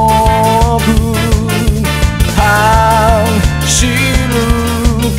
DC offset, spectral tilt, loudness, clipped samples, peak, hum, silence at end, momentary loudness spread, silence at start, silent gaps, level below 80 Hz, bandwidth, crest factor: under 0.1%; -4.5 dB/octave; -11 LUFS; 0.5%; 0 dBFS; none; 0 s; 4 LU; 0 s; none; -16 dBFS; 16.5 kHz; 10 dB